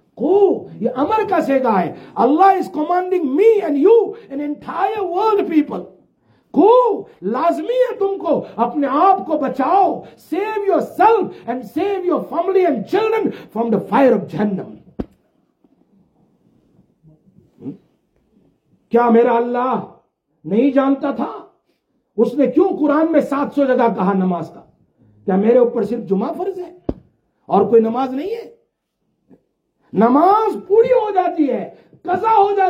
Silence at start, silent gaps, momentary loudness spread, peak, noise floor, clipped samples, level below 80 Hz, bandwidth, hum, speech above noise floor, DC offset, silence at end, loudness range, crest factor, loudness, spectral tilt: 0.15 s; none; 14 LU; -2 dBFS; -70 dBFS; under 0.1%; -56 dBFS; 14.5 kHz; none; 55 dB; under 0.1%; 0 s; 5 LU; 16 dB; -17 LUFS; -8 dB/octave